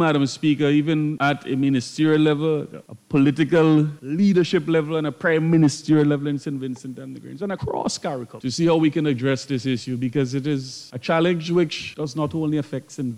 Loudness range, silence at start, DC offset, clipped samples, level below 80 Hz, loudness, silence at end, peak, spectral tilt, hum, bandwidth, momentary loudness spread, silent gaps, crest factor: 4 LU; 0 s; under 0.1%; under 0.1%; -58 dBFS; -21 LUFS; 0 s; -6 dBFS; -6.5 dB/octave; none; 10.5 kHz; 12 LU; none; 14 dB